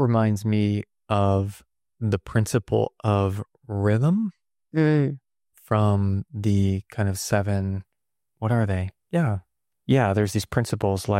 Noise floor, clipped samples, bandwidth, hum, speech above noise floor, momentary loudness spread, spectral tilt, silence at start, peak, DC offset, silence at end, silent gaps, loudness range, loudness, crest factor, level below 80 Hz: -82 dBFS; under 0.1%; 15 kHz; none; 59 dB; 10 LU; -7 dB/octave; 0 s; -10 dBFS; under 0.1%; 0 s; none; 2 LU; -24 LUFS; 14 dB; -54 dBFS